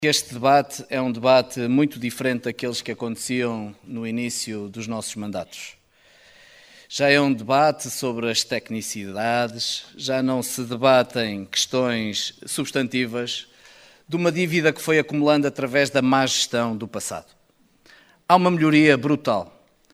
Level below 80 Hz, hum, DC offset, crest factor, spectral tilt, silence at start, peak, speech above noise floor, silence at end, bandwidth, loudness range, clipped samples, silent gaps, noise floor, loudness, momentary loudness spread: -64 dBFS; none; under 0.1%; 22 dB; -4 dB/octave; 0 s; 0 dBFS; 37 dB; 0.45 s; 16 kHz; 7 LU; under 0.1%; none; -59 dBFS; -22 LUFS; 12 LU